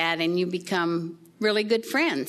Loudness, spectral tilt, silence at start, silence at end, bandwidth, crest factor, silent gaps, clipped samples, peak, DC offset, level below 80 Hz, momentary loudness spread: -25 LUFS; -5 dB/octave; 0 s; 0 s; 13.5 kHz; 16 dB; none; under 0.1%; -8 dBFS; under 0.1%; -76 dBFS; 6 LU